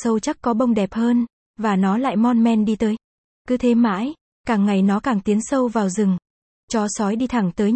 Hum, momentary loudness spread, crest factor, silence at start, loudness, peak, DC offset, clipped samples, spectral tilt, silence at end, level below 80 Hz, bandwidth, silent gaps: none; 8 LU; 12 dB; 0 s; -20 LUFS; -6 dBFS; under 0.1%; under 0.1%; -6.5 dB/octave; 0 s; -52 dBFS; 8.8 kHz; 1.33-1.54 s, 3.04-3.45 s, 4.21-4.44 s, 6.30-6.68 s